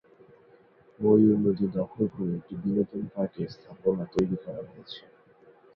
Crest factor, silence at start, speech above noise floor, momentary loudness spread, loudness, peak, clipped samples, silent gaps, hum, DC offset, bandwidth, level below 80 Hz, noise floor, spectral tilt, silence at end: 20 dB; 1 s; 31 dB; 20 LU; -27 LUFS; -10 dBFS; under 0.1%; none; none; under 0.1%; 7 kHz; -60 dBFS; -58 dBFS; -9.5 dB/octave; 0.75 s